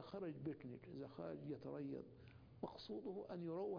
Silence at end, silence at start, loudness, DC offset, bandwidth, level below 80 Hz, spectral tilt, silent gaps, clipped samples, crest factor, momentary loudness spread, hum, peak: 0 s; 0 s; -51 LUFS; under 0.1%; 5.2 kHz; -78 dBFS; -7 dB/octave; none; under 0.1%; 18 dB; 6 LU; none; -32 dBFS